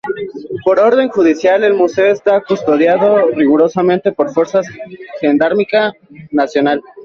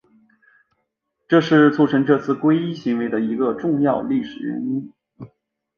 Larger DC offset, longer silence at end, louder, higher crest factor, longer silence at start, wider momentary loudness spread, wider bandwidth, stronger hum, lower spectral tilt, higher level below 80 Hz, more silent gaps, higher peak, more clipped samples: neither; second, 0 s vs 0.5 s; first, -13 LUFS vs -19 LUFS; second, 12 dB vs 18 dB; second, 0.05 s vs 1.3 s; about the same, 9 LU vs 11 LU; about the same, 7.2 kHz vs 6.8 kHz; neither; second, -6 dB/octave vs -8 dB/octave; first, -56 dBFS vs -62 dBFS; neither; about the same, -2 dBFS vs -2 dBFS; neither